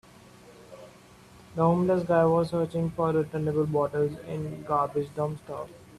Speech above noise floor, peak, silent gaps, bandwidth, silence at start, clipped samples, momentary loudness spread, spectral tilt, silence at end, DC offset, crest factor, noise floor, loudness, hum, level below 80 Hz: 26 dB; -10 dBFS; none; 13 kHz; 0.5 s; under 0.1%; 15 LU; -8.5 dB/octave; 0 s; under 0.1%; 18 dB; -52 dBFS; -27 LUFS; none; -60 dBFS